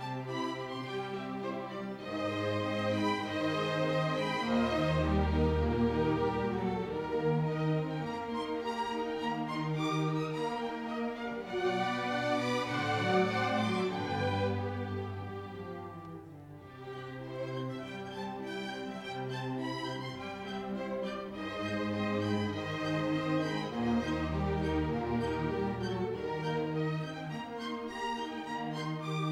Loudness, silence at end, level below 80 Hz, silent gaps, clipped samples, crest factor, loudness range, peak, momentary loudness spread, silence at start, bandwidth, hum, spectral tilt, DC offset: -34 LUFS; 0 s; -50 dBFS; none; under 0.1%; 16 dB; 8 LU; -18 dBFS; 10 LU; 0 s; 13.5 kHz; none; -6.5 dB/octave; under 0.1%